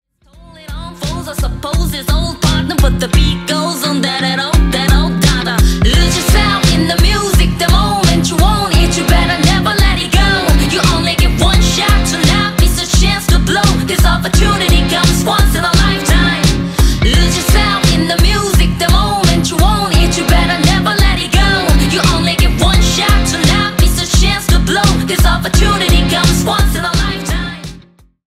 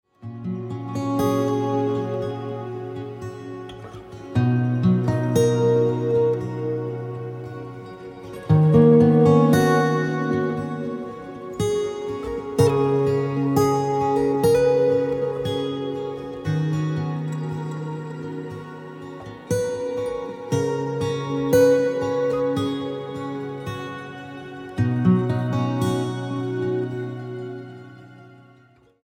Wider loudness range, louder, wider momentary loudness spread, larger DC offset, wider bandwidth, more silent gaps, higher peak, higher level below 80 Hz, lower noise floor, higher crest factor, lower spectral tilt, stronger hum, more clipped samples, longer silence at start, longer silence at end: second, 2 LU vs 9 LU; first, -12 LUFS vs -22 LUFS; second, 4 LU vs 18 LU; neither; about the same, 16 kHz vs 16.5 kHz; neither; first, 0 dBFS vs -4 dBFS; first, -14 dBFS vs -52 dBFS; second, -41 dBFS vs -55 dBFS; second, 10 dB vs 18 dB; second, -4.5 dB/octave vs -7.5 dB/octave; neither; neither; first, 0.7 s vs 0.2 s; second, 0.5 s vs 0.7 s